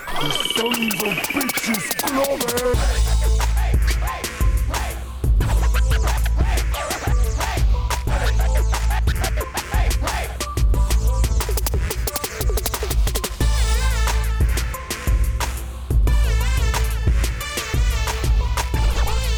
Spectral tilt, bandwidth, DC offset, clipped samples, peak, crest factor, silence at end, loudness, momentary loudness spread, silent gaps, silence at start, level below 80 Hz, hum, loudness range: -4 dB/octave; over 20 kHz; under 0.1%; under 0.1%; -8 dBFS; 10 dB; 0 s; -21 LUFS; 4 LU; none; 0 s; -20 dBFS; none; 2 LU